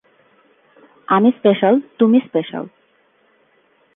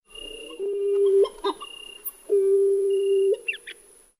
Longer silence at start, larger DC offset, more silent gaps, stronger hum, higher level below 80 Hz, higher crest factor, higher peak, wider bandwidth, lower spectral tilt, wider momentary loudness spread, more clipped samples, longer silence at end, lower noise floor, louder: first, 1.1 s vs 0.15 s; neither; neither; neither; second, -70 dBFS vs -60 dBFS; first, 18 dB vs 12 dB; first, 0 dBFS vs -12 dBFS; second, 3.8 kHz vs 15.5 kHz; first, -10 dB/octave vs -2.5 dB/octave; about the same, 15 LU vs 17 LU; neither; first, 1.3 s vs 0.45 s; first, -58 dBFS vs -47 dBFS; first, -16 LUFS vs -23 LUFS